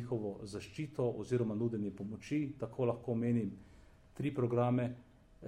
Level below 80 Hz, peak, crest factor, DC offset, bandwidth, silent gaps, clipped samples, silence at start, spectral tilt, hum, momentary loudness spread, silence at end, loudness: -66 dBFS; -20 dBFS; 16 dB; under 0.1%; 10.5 kHz; none; under 0.1%; 0 s; -8.5 dB/octave; none; 11 LU; 0 s; -37 LUFS